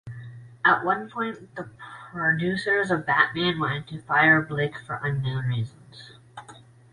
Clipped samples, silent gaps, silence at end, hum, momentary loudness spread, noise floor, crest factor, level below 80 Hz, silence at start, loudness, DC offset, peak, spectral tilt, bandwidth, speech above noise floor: under 0.1%; none; 0.35 s; none; 21 LU; -49 dBFS; 22 dB; -58 dBFS; 0.05 s; -24 LUFS; under 0.1%; -4 dBFS; -6.5 dB/octave; 11 kHz; 25 dB